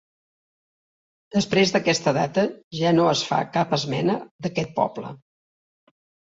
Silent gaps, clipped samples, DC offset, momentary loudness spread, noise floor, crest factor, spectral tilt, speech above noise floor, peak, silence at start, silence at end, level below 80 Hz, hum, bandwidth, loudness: 2.64-2.71 s, 4.31-4.39 s; under 0.1%; under 0.1%; 8 LU; under -90 dBFS; 20 dB; -5 dB/octave; over 68 dB; -4 dBFS; 1.35 s; 1.1 s; -60 dBFS; none; 8 kHz; -22 LUFS